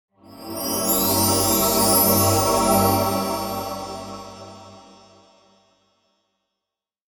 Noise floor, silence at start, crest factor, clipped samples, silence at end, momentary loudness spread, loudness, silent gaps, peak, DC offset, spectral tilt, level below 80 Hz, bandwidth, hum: -86 dBFS; 0.3 s; 18 dB; under 0.1%; 2.4 s; 21 LU; -19 LUFS; none; -6 dBFS; under 0.1%; -3.5 dB/octave; -46 dBFS; 19 kHz; none